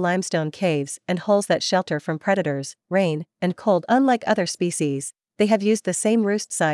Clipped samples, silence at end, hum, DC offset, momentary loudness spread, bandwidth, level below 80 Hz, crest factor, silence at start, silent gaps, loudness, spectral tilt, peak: under 0.1%; 0 s; none; under 0.1%; 8 LU; 12 kHz; -76 dBFS; 16 dB; 0 s; none; -22 LUFS; -5 dB/octave; -4 dBFS